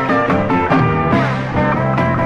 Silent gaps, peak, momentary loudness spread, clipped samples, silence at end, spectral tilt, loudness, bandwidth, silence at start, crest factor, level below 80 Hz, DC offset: none; -2 dBFS; 3 LU; under 0.1%; 0 s; -8 dB/octave; -15 LUFS; 8 kHz; 0 s; 14 dB; -36 dBFS; under 0.1%